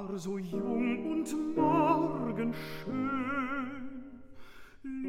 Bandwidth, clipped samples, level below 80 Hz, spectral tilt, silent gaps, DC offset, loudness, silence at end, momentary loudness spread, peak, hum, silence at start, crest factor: 16 kHz; under 0.1%; -60 dBFS; -6.5 dB/octave; none; under 0.1%; -32 LUFS; 0 s; 16 LU; -16 dBFS; none; 0 s; 18 dB